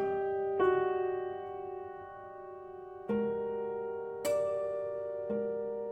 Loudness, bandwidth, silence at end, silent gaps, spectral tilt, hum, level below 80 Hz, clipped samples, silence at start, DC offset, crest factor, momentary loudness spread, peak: -34 LUFS; 15.5 kHz; 0 s; none; -6 dB/octave; none; -70 dBFS; under 0.1%; 0 s; under 0.1%; 16 dB; 17 LU; -18 dBFS